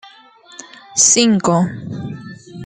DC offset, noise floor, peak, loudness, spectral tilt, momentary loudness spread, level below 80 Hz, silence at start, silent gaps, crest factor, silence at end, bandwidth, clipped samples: under 0.1%; -44 dBFS; 0 dBFS; -13 LUFS; -3 dB/octave; 25 LU; -56 dBFS; 0.05 s; none; 18 dB; 0 s; 10 kHz; under 0.1%